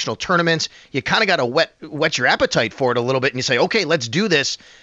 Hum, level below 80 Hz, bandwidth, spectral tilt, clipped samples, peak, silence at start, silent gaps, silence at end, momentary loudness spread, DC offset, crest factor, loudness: none; -52 dBFS; 8.2 kHz; -3.5 dB/octave; under 0.1%; -4 dBFS; 0 s; none; 0.25 s; 5 LU; under 0.1%; 14 dB; -18 LUFS